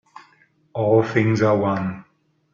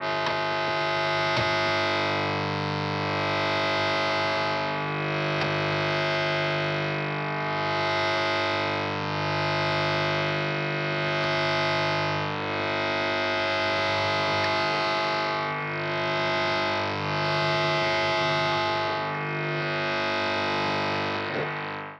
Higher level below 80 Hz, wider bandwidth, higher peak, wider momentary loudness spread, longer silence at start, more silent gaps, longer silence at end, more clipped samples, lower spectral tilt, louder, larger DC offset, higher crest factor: about the same, -60 dBFS vs -62 dBFS; second, 7.2 kHz vs 9.8 kHz; first, -4 dBFS vs -12 dBFS; first, 14 LU vs 4 LU; first, 0.75 s vs 0 s; neither; first, 0.5 s vs 0 s; neither; first, -8 dB/octave vs -5 dB/octave; first, -20 LUFS vs -25 LUFS; neither; about the same, 18 dB vs 14 dB